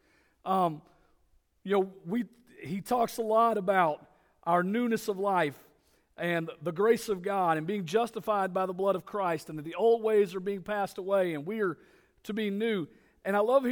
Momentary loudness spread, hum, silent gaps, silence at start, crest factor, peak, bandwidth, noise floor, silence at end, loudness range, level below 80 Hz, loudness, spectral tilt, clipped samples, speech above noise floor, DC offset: 13 LU; none; none; 0.45 s; 18 dB; -12 dBFS; over 20 kHz; -68 dBFS; 0 s; 2 LU; -70 dBFS; -30 LUFS; -6 dB/octave; under 0.1%; 39 dB; under 0.1%